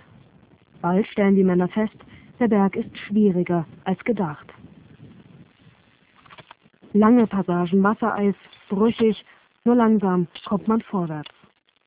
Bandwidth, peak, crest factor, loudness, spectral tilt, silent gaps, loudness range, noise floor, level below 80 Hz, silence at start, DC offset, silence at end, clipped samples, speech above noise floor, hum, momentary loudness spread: 4 kHz; -4 dBFS; 20 dB; -21 LUFS; -12 dB/octave; none; 6 LU; -59 dBFS; -58 dBFS; 0.85 s; under 0.1%; 0.65 s; under 0.1%; 39 dB; none; 12 LU